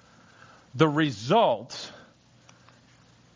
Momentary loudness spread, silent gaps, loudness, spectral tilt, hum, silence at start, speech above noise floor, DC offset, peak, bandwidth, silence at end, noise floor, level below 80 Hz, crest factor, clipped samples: 18 LU; none; -24 LUFS; -6 dB/octave; none; 0.75 s; 34 dB; under 0.1%; -8 dBFS; 7.6 kHz; 1.45 s; -57 dBFS; -66 dBFS; 22 dB; under 0.1%